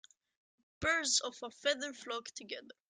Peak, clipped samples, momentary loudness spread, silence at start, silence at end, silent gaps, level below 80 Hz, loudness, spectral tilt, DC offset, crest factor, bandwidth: -16 dBFS; under 0.1%; 14 LU; 0.8 s; 0.2 s; none; -68 dBFS; -35 LUFS; -0.5 dB/octave; under 0.1%; 22 dB; 11 kHz